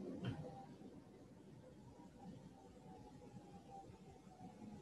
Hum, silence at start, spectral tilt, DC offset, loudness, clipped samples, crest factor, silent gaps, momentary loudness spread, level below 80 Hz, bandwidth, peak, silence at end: none; 0 s; -7 dB/octave; under 0.1%; -57 LUFS; under 0.1%; 22 dB; none; 12 LU; -72 dBFS; 12 kHz; -34 dBFS; 0 s